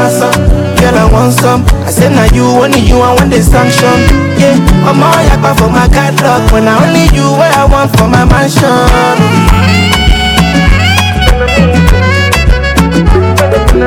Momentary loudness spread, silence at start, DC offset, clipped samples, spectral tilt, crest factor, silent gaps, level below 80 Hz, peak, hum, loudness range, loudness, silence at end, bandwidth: 2 LU; 0 s; under 0.1%; 10%; -5.5 dB/octave; 6 dB; none; -12 dBFS; 0 dBFS; none; 1 LU; -7 LUFS; 0 s; 18.5 kHz